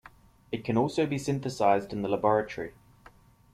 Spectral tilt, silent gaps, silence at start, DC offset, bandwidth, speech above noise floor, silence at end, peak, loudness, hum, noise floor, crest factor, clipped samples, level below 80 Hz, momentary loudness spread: -6.5 dB/octave; none; 0.5 s; under 0.1%; 14.5 kHz; 29 dB; 0.85 s; -10 dBFS; -28 LUFS; none; -57 dBFS; 20 dB; under 0.1%; -60 dBFS; 12 LU